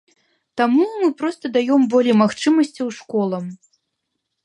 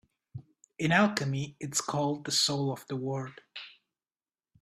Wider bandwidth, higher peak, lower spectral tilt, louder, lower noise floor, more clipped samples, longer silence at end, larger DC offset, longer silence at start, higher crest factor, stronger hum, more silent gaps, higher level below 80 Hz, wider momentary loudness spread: second, 11 kHz vs 15 kHz; first, -2 dBFS vs -8 dBFS; first, -6 dB/octave vs -4 dB/octave; first, -18 LUFS vs -29 LUFS; second, -76 dBFS vs under -90 dBFS; neither; about the same, 0.9 s vs 0.9 s; neither; first, 0.55 s vs 0.35 s; second, 16 dB vs 24 dB; neither; neither; about the same, -70 dBFS vs -70 dBFS; second, 12 LU vs 24 LU